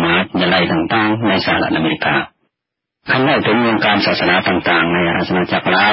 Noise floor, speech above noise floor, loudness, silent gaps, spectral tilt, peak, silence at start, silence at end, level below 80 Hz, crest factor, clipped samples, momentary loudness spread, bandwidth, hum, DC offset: -80 dBFS; 66 dB; -14 LUFS; none; -9 dB/octave; 0 dBFS; 0 s; 0 s; -44 dBFS; 14 dB; under 0.1%; 3 LU; 5.8 kHz; none; under 0.1%